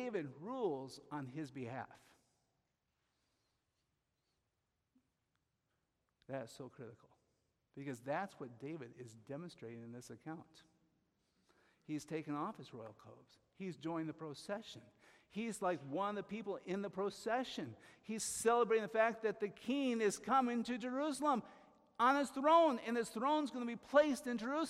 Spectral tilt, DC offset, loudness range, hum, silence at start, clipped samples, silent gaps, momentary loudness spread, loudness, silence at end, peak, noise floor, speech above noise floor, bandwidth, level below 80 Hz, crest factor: -4.5 dB/octave; under 0.1%; 19 LU; none; 0 s; under 0.1%; none; 19 LU; -39 LUFS; 0 s; -18 dBFS; -87 dBFS; 47 dB; 15 kHz; -80 dBFS; 24 dB